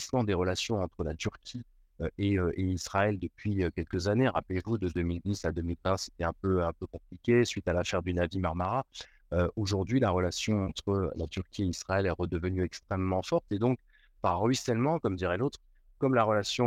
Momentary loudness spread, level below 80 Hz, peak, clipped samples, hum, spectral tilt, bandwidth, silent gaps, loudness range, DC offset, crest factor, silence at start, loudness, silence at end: 8 LU; -50 dBFS; -12 dBFS; under 0.1%; none; -6 dB/octave; 13.5 kHz; none; 2 LU; under 0.1%; 18 dB; 0 s; -31 LUFS; 0 s